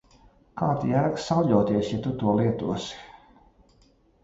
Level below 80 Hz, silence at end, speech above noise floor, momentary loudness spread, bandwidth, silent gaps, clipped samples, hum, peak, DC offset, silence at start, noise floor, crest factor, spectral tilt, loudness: -54 dBFS; 1.15 s; 36 dB; 12 LU; 8 kHz; none; under 0.1%; none; -8 dBFS; under 0.1%; 0.55 s; -61 dBFS; 18 dB; -7.5 dB/octave; -25 LUFS